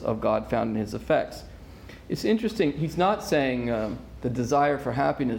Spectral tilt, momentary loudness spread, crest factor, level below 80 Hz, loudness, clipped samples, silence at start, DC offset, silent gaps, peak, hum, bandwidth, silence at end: -6.5 dB/octave; 14 LU; 16 dB; -48 dBFS; -26 LUFS; under 0.1%; 0 s; under 0.1%; none; -10 dBFS; none; 17 kHz; 0 s